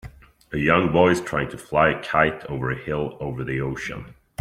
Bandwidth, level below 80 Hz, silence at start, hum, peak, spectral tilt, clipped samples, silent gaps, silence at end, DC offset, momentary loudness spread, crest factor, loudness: 15 kHz; -46 dBFS; 0.05 s; none; -2 dBFS; -6.5 dB/octave; under 0.1%; none; 0.3 s; under 0.1%; 13 LU; 22 dB; -22 LUFS